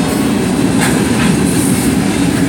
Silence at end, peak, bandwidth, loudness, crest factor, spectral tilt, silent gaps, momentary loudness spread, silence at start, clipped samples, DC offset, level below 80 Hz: 0 s; 0 dBFS; 17 kHz; -12 LUFS; 12 dB; -5 dB/octave; none; 2 LU; 0 s; under 0.1%; under 0.1%; -32 dBFS